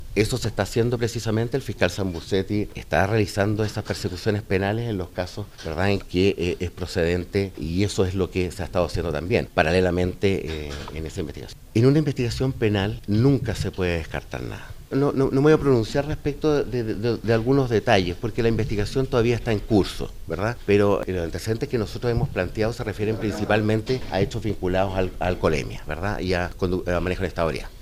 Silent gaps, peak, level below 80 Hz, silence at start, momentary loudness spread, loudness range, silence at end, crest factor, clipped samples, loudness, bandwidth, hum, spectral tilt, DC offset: none; -2 dBFS; -38 dBFS; 0 s; 9 LU; 3 LU; 0 s; 22 dB; under 0.1%; -24 LUFS; 16 kHz; none; -6.5 dB/octave; under 0.1%